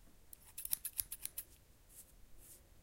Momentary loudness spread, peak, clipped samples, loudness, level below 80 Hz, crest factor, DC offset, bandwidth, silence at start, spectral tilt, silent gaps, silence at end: 22 LU; -14 dBFS; under 0.1%; -43 LUFS; -66 dBFS; 36 dB; under 0.1%; 17 kHz; 0 s; 0 dB/octave; none; 0 s